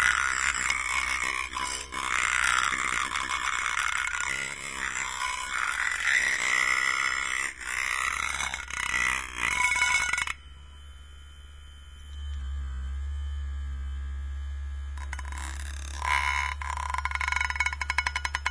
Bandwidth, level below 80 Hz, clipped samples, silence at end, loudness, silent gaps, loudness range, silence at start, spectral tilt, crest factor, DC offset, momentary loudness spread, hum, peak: 11 kHz; -40 dBFS; under 0.1%; 0 s; -28 LUFS; none; 11 LU; 0 s; -1 dB/octave; 24 dB; 0.2%; 13 LU; none; -6 dBFS